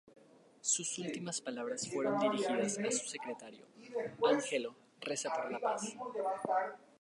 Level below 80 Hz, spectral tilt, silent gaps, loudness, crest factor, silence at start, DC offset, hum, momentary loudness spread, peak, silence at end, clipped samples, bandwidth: -86 dBFS; -3 dB/octave; none; -36 LUFS; 18 dB; 0.05 s; under 0.1%; none; 11 LU; -18 dBFS; 0.25 s; under 0.1%; 11.5 kHz